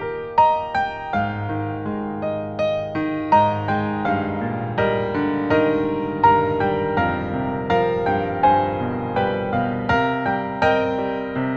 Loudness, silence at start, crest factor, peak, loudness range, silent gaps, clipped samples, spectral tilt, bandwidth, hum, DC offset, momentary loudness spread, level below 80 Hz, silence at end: -21 LUFS; 0 s; 16 dB; -4 dBFS; 3 LU; none; under 0.1%; -8 dB/octave; 7.2 kHz; none; under 0.1%; 7 LU; -46 dBFS; 0 s